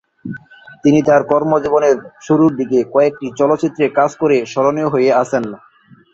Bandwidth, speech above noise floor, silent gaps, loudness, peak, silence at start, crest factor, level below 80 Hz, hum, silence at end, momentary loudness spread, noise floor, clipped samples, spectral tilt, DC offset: 8 kHz; 24 dB; none; -15 LUFS; 0 dBFS; 0.25 s; 14 dB; -56 dBFS; none; 0.55 s; 8 LU; -37 dBFS; under 0.1%; -7 dB/octave; under 0.1%